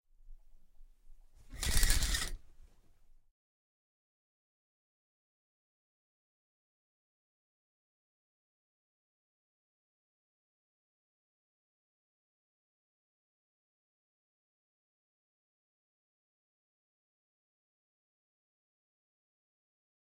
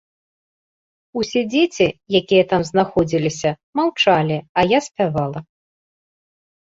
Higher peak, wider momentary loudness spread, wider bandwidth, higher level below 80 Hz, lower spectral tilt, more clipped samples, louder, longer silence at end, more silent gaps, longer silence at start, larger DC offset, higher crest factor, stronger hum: second, -12 dBFS vs -2 dBFS; first, 23 LU vs 8 LU; first, 16 kHz vs 7.8 kHz; first, -46 dBFS vs -52 dBFS; second, -1.5 dB/octave vs -5.5 dB/octave; neither; second, -34 LUFS vs -18 LUFS; first, 17.75 s vs 1.35 s; second, none vs 3.63-3.73 s, 4.49-4.55 s; second, 0.25 s vs 1.15 s; neither; first, 32 dB vs 18 dB; neither